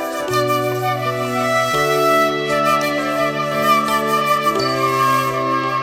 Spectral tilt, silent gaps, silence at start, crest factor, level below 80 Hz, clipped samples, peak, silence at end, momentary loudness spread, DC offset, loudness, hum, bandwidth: -4.5 dB/octave; none; 0 s; 14 dB; -52 dBFS; under 0.1%; -4 dBFS; 0 s; 5 LU; under 0.1%; -17 LUFS; none; 16.5 kHz